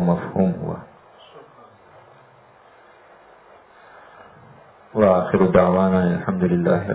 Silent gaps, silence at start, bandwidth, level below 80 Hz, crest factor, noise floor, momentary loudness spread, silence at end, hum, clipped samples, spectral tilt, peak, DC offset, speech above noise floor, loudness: none; 0 s; 4 kHz; -48 dBFS; 22 dB; -51 dBFS; 13 LU; 0 s; none; under 0.1%; -12.5 dB/octave; 0 dBFS; under 0.1%; 33 dB; -19 LUFS